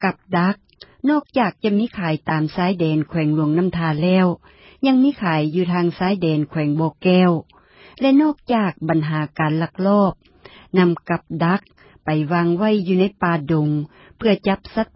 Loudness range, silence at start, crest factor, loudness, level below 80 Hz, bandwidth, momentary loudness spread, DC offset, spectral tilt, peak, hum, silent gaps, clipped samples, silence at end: 2 LU; 0 s; 16 dB; -19 LUFS; -52 dBFS; 5.8 kHz; 6 LU; under 0.1%; -12 dB/octave; -2 dBFS; none; none; under 0.1%; 0.1 s